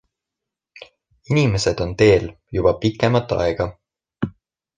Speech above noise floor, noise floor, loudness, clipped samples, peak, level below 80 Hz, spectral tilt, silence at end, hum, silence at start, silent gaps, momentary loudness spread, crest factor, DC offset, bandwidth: 67 dB; -85 dBFS; -20 LUFS; under 0.1%; -2 dBFS; -40 dBFS; -6 dB/octave; 0.45 s; none; 0.8 s; none; 14 LU; 20 dB; under 0.1%; 9.8 kHz